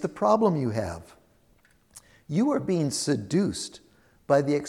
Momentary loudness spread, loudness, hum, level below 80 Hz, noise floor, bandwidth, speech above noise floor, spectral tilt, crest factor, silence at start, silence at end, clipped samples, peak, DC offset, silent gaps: 13 LU; -26 LUFS; none; -58 dBFS; -63 dBFS; 14.5 kHz; 37 dB; -6 dB/octave; 18 dB; 0 s; 0 s; under 0.1%; -8 dBFS; under 0.1%; none